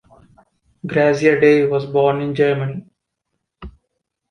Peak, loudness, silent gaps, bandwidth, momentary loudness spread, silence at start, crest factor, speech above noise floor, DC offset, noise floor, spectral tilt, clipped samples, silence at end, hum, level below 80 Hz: -2 dBFS; -16 LUFS; none; 9.8 kHz; 13 LU; 0.85 s; 18 dB; 60 dB; under 0.1%; -76 dBFS; -7 dB/octave; under 0.1%; 0.6 s; none; -50 dBFS